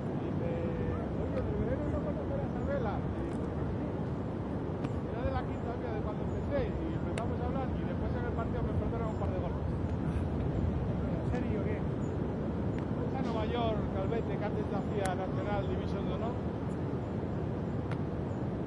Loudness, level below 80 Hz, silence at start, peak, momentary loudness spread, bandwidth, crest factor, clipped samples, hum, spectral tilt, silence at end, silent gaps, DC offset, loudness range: -34 LUFS; -44 dBFS; 0 s; -16 dBFS; 3 LU; 11.5 kHz; 16 dB; under 0.1%; none; -8.5 dB/octave; 0 s; none; under 0.1%; 2 LU